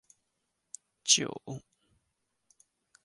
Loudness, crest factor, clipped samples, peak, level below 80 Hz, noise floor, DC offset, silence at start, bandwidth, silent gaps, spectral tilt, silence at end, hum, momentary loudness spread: -27 LUFS; 28 dB; under 0.1%; -10 dBFS; -76 dBFS; -81 dBFS; under 0.1%; 1.05 s; 11.5 kHz; none; -1 dB/octave; 1.45 s; none; 25 LU